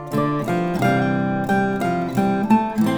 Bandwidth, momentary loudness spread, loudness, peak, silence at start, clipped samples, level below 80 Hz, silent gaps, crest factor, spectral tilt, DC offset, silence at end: over 20 kHz; 4 LU; -20 LUFS; -4 dBFS; 0 s; under 0.1%; -50 dBFS; none; 16 dB; -7.5 dB/octave; under 0.1%; 0 s